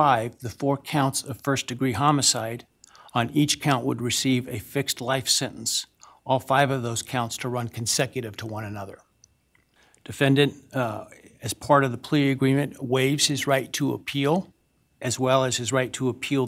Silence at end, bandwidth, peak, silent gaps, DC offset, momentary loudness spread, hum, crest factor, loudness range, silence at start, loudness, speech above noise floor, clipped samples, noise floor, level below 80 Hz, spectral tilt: 0 s; 16.5 kHz; -6 dBFS; none; under 0.1%; 13 LU; none; 20 dB; 5 LU; 0 s; -24 LUFS; 41 dB; under 0.1%; -65 dBFS; -62 dBFS; -4 dB/octave